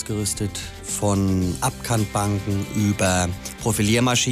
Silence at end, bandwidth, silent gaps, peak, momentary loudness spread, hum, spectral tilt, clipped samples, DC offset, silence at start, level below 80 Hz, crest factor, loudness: 0 s; 16 kHz; none; -6 dBFS; 8 LU; none; -4.5 dB/octave; under 0.1%; under 0.1%; 0 s; -42 dBFS; 16 dB; -22 LUFS